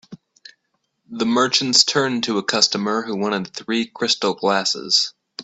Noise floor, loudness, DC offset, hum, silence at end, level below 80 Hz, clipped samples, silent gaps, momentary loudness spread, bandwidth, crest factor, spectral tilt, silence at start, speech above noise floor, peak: -72 dBFS; -18 LUFS; under 0.1%; none; 0 s; -66 dBFS; under 0.1%; none; 10 LU; 8.4 kHz; 22 dB; -2.5 dB/octave; 0.1 s; 52 dB; 0 dBFS